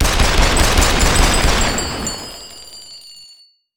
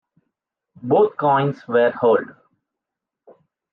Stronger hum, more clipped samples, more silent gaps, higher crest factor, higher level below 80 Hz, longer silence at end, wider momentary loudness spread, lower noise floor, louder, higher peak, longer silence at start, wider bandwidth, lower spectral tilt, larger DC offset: neither; neither; neither; about the same, 16 dB vs 16 dB; first, -20 dBFS vs -76 dBFS; second, 0 s vs 1.4 s; first, 20 LU vs 9 LU; second, -48 dBFS vs -84 dBFS; first, -15 LUFS vs -18 LUFS; first, 0 dBFS vs -6 dBFS; second, 0 s vs 0.85 s; first, 19.5 kHz vs 5.4 kHz; second, -3 dB/octave vs -9 dB/octave; neither